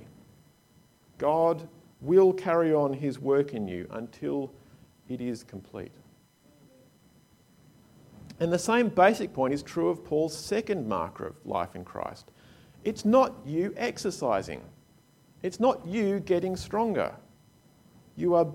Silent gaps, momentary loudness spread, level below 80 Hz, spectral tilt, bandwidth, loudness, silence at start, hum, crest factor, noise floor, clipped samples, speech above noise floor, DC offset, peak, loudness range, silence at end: none; 17 LU; -62 dBFS; -6 dB/octave; 16 kHz; -28 LUFS; 0 s; none; 20 dB; -62 dBFS; under 0.1%; 34 dB; under 0.1%; -8 dBFS; 12 LU; 0 s